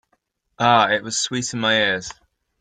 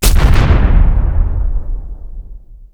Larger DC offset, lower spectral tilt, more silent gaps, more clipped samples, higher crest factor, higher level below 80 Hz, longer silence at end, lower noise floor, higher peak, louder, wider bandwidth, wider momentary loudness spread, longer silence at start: neither; second, -2.5 dB/octave vs -5.5 dB/octave; neither; second, under 0.1% vs 0.6%; first, 18 dB vs 10 dB; second, -58 dBFS vs -12 dBFS; first, 0.5 s vs 0.2 s; first, -69 dBFS vs -32 dBFS; about the same, -2 dBFS vs 0 dBFS; second, -19 LUFS vs -14 LUFS; second, 9.6 kHz vs over 20 kHz; second, 8 LU vs 21 LU; first, 0.6 s vs 0 s